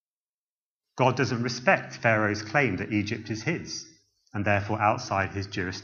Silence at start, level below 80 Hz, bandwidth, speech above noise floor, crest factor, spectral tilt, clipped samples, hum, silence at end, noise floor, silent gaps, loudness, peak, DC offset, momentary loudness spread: 0.95 s; -62 dBFS; 7.4 kHz; over 64 dB; 22 dB; -5.5 dB/octave; under 0.1%; none; 0 s; under -90 dBFS; none; -26 LUFS; -6 dBFS; under 0.1%; 8 LU